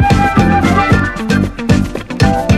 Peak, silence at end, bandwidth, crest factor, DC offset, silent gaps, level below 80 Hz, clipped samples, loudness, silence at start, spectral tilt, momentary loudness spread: 0 dBFS; 0 s; 14 kHz; 12 dB; under 0.1%; none; -24 dBFS; under 0.1%; -12 LUFS; 0 s; -6.5 dB/octave; 4 LU